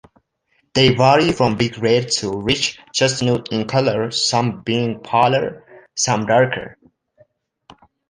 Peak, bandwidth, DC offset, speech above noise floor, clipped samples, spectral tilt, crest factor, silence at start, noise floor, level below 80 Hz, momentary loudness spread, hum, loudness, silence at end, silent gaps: -2 dBFS; 10.5 kHz; under 0.1%; 48 dB; under 0.1%; -4 dB/octave; 18 dB; 0.75 s; -65 dBFS; -48 dBFS; 8 LU; none; -18 LUFS; 1.4 s; none